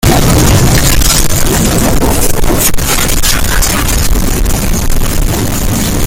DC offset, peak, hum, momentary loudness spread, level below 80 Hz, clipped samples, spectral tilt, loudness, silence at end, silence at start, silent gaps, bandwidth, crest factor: under 0.1%; 0 dBFS; none; 6 LU; -12 dBFS; 0.1%; -4 dB/octave; -10 LUFS; 0 s; 0.05 s; none; 17.5 kHz; 8 dB